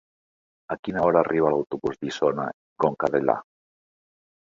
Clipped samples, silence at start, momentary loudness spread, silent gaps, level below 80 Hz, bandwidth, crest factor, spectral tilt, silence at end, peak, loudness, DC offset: under 0.1%; 0.7 s; 10 LU; 0.79-0.83 s, 2.54-2.76 s; -60 dBFS; 7.6 kHz; 22 dB; -6.5 dB/octave; 1.1 s; -4 dBFS; -24 LUFS; under 0.1%